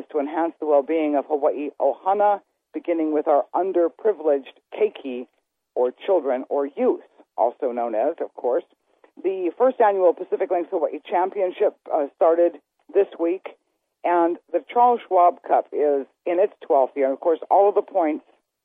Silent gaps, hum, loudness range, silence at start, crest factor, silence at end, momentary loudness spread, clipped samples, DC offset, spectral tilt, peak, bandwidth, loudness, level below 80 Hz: none; none; 4 LU; 0 s; 16 dB; 0.45 s; 9 LU; under 0.1%; under 0.1%; -8 dB/octave; -6 dBFS; 3.8 kHz; -22 LUFS; -78 dBFS